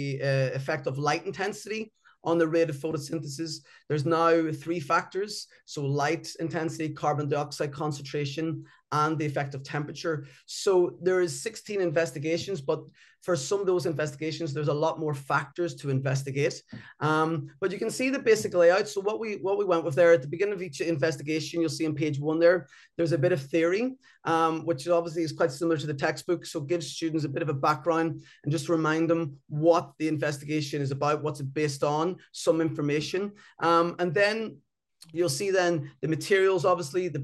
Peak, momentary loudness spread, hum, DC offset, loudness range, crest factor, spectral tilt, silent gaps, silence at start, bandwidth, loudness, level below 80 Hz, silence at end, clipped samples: -10 dBFS; 9 LU; none; under 0.1%; 4 LU; 18 dB; -5.5 dB/octave; none; 0 s; 12.5 kHz; -28 LUFS; -72 dBFS; 0 s; under 0.1%